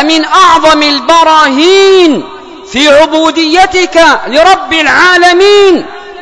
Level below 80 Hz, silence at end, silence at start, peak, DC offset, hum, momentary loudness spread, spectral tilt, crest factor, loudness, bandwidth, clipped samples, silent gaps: -38 dBFS; 0 s; 0 s; 0 dBFS; under 0.1%; none; 5 LU; -2 dB/octave; 6 dB; -5 LUFS; 11 kHz; 10%; none